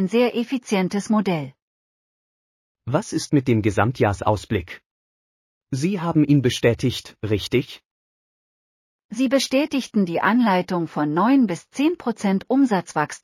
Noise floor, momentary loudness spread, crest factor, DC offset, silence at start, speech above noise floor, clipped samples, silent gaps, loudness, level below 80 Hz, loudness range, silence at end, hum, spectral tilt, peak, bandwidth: under -90 dBFS; 9 LU; 18 dB; under 0.1%; 0 s; over 70 dB; under 0.1%; 1.62-2.75 s, 4.86-5.61 s, 7.86-9.09 s; -21 LUFS; -52 dBFS; 4 LU; 0.05 s; none; -6 dB/octave; -4 dBFS; 14.5 kHz